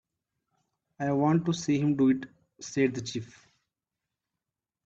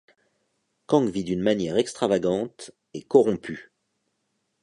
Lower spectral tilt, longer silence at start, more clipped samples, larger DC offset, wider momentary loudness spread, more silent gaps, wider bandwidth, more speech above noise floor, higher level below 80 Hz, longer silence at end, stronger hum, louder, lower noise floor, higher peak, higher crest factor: about the same, -6.5 dB/octave vs -6 dB/octave; about the same, 1 s vs 0.9 s; neither; neither; about the same, 17 LU vs 19 LU; neither; second, 8 kHz vs 11 kHz; first, 62 dB vs 52 dB; second, -68 dBFS vs -60 dBFS; first, 1.6 s vs 1 s; neither; second, -28 LUFS vs -24 LUFS; first, -89 dBFS vs -75 dBFS; second, -14 dBFS vs -4 dBFS; about the same, 18 dB vs 20 dB